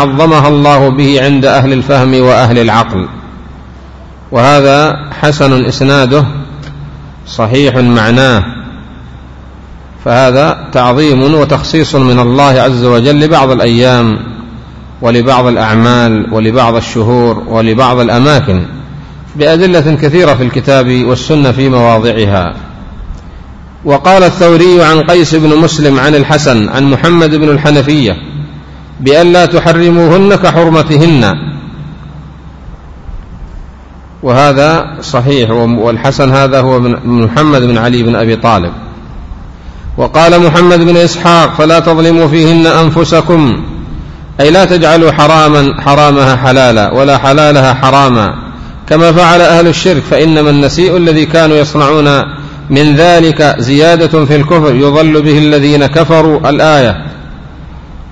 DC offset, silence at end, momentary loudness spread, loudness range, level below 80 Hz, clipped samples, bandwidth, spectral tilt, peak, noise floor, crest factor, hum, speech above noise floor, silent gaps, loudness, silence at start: 0.8%; 0 s; 14 LU; 4 LU; -30 dBFS; 3%; 11 kHz; -6.5 dB/octave; 0 dBFS; -30 dBFS; 6 dB; none; 24 dB; none; -6 LUFS; 0 s